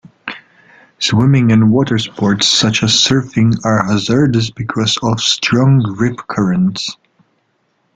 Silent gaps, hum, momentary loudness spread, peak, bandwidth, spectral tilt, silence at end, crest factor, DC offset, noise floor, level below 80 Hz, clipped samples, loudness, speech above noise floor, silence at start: none; none; 9 LU; 0 dBFS; 9.4 kHz; -4.5 dB/octave; 1 s; 14 dB; under 0.1%; -62 dBFS; -46 dBFS; under 0.1%; -13 LUFS; 49 dB; 0.25 s